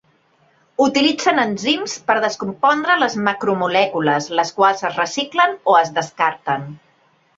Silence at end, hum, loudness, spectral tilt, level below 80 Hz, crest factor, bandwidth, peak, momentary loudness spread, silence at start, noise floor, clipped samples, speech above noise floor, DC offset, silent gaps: 0.6 s; none; -17 LUFS; -3.5 dB/octave; -64 dBFS; 18 dB; 7.8 kHz; -2 dBFS; 7 LU; 0.8 s; -58 dBFS; under 0.1%; 40 dB; under 0.1%; none